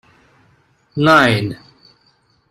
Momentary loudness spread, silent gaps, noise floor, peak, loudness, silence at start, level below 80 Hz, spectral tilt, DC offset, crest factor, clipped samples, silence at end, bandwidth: 19 LU; none; -58 dBFS; 0 dBFS; -14 LUFS; 0.95 s; -52 dBFS; -6 dB/octave; under 0.1%; 18 dB; under 0.1%; 0.95 s; 15 kHz